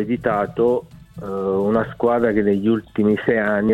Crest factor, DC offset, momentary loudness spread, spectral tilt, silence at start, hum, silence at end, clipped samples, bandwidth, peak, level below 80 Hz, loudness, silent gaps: 14 dB; under 0.1%; 7 LU; -8.5 dB/octave; 0 s; none; 0 s; under 0.1%; 4.7 kHz; -4 dBFS; -48 dBFS; -20 LUFS; none